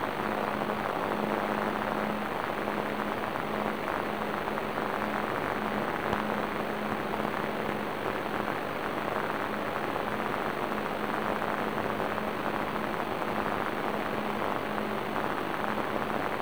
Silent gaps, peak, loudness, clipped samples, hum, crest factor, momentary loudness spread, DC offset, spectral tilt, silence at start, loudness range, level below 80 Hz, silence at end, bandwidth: none; -14 dBFS; -31 LUFS; under 0.1%; none; 18 dB; 2 LU; 0.6%; -5.5 dB/octave; 0 s; 1 LU; -58 dBFS; 0 s; over 20 kHz